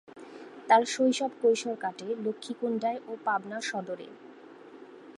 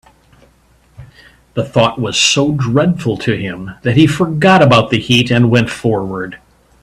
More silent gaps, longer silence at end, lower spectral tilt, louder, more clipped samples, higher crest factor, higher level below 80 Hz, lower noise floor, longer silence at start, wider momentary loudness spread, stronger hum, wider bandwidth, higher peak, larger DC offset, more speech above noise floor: neither; second, 0.05 s vs 0.45 s; second, -3.5 dB/octave vs -5 dB/octave; second, -29 LUFS vs -13 LUFS; neither; first, 22 dB vs 14 dB; second, -86 dBFS vs -44 dBFS; about the same, -50 dBFS vs -51 dBFS; second, 0.15 s vs 1 s; first, 25 LU vs 13 LU; neither; second, 11.5 kHz vs 13 kHz; second, -8 dBFS vs 0 dBFS; neither; second, 21 dB vs 38 dB